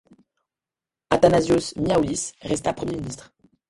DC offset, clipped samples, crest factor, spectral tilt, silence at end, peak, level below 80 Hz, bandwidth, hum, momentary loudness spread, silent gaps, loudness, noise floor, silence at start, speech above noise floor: under 0.1%; under 0.1%; 24 dB; -5 dB/octave; 0.55 s; 0 dBFS; -48 dBFS; 11.5 kHz; none; 13 LU; none; -22 LUFS; -90 dBFS; 1.1 s; 68 dB